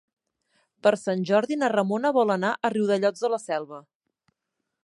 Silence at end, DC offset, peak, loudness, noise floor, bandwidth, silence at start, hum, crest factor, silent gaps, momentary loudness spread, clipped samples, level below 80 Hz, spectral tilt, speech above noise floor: 1.05 s; under 0.1%; -6 dBFS; -24 LUFS; -82 dBFS; 11.5 kHz; 0.85 s; none; 20 dB; none; 8 LU; under 0.1%; -78 dBFS; -5.5 dB/octave; 58 dB